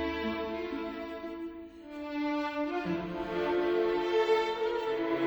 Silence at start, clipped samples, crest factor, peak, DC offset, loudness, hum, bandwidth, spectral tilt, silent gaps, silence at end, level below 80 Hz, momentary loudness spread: 0 s; under 0.1%; 16 dB; -16 dBFS; under 0.1%; -32 LUFS; none; over 20 kHz; -6 dB/octave; none; 0 s; -58 dBFS; 12 LU